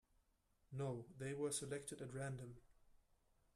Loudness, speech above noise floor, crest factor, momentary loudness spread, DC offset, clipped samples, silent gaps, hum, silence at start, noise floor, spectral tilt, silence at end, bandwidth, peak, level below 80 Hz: -48 LUFS; 33 dB; 20 dB; 12 LU; under 0.1%; under 0.1%; none; none; 0.7 s; -80 dBFS; -4.5 dB/octave; 0.55 s; 13.5 kHz; -30 dBFS; -74 dBFS